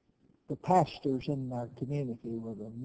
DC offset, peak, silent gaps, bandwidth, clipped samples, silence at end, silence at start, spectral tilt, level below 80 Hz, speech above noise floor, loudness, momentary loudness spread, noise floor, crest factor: under 0.1%; -12 dBFS; none; 8 kHz; under 0.1%; 0 s; 0.5 s; -8 dB/octave; -64 dBFS; 31 dB; -33 LUFS; 12 LU; -64 dBFS; 22 dB